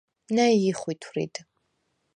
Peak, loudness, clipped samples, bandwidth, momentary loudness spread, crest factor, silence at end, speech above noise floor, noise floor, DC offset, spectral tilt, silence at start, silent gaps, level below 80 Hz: -8 dBFS; -25 LUFS; under 0.1%; 10 kHz; 13 LU; 20 dB; 0.75 s; 50 dB; -74 dBFS; under 0.1%; -5 dB/octave; 0.3 s; none; -74 dBFS